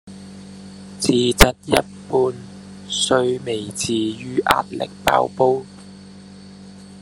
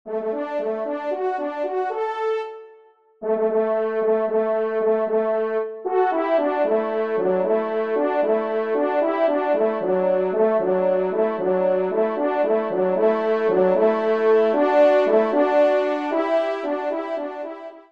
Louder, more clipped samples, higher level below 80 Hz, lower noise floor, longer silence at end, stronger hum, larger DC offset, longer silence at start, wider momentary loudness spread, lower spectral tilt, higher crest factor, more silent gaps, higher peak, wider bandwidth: about the same, -19 LUFS vs -21 LUFS; neither; first, -34 dBFS vs -74 dBFS; second, -40 dBFS vs -52 dBFS; about the same, 0 s vs 0.1 s; neither; second, under 0.1% vs 0.2%; about the same, 0.05 s vs 0.05 s; first, 25 LU vs 8 LU; second, -3.5 dB/octave vs -7.5 dB/octave; first, 20 dB vs 14 dB; neither; first, 0 dBFS vs -6 dBFS; first, 13 kHz vs 6.2 kHz